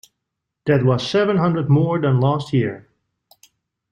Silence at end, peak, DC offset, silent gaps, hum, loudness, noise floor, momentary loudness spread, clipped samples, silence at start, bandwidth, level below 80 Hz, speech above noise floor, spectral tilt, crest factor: 1.15 s; -4 dBFS; under 0.1%; none; none; -18 LUFS; -80 dBFS; 7 LU; under 0.1%; 0.65 s; 8.8 kHz; -56 dBFS; 62 dB; -8 dB/octave; 16 dB